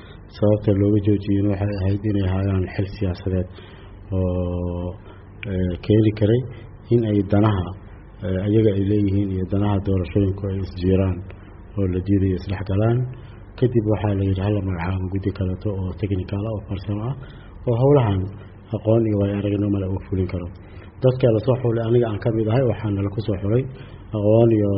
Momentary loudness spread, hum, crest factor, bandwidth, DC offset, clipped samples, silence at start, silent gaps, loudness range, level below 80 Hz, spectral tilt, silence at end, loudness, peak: 14 LU; none; 16 dB; 5.6 kHz; under 0.1%; under 0.1%; 0 s; none; 3 LU; -42 dBFS; -8.5 dB/octave; 0 s; -21 LUFS; -4 dBFS